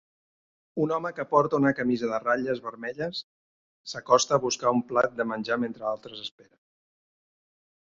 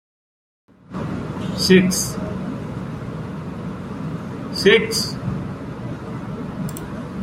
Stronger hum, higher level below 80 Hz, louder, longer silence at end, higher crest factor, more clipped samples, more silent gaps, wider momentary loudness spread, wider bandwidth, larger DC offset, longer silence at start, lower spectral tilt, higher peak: neither; second, -68 dBFS vs -46 dBFS; second, -26 LUFS vs -22 LUFS; first, 1.55 s vs 0 s; about the same, 24 dB vs 22 dB; neither; first, 3.24-3.84 s vs none; about the same, 15 LU vs 16 LU; second, 7.8 kHz vs 16 kHz; neither; second, 0.75 s vs 0.9 s; about the same, -4.5 dB/octave vs -4.5 dB/octave; about the same, -4 dBFS vs -2 dBFS